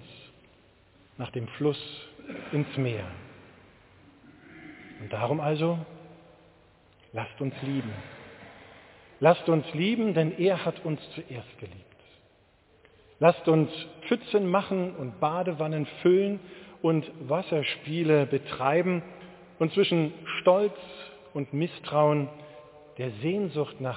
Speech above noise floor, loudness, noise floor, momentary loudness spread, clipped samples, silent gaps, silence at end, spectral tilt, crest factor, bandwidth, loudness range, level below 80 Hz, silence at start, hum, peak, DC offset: 35 dB; -28 LUFS; -62 dBFS; 22 LU; under 0.1%; none; 0 s; -10.5 dB/octave; 22 dB; 4 kHz; 7 LU; -64 dBFS; 0 s; none; -6 dBFS; under 0.1%